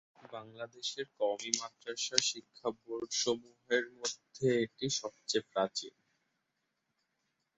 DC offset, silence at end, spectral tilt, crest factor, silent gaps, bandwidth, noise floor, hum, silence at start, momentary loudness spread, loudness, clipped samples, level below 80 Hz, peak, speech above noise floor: under 0.1%; 1.7 s; -2.5 dB/octave; 34 dB; none; 8.2 kHz; -84 dBFS; none; 0.25 s; 12 LU; -35 LUFS; under 0.1%; -78 dBFS; -4 dBFS; 47 dB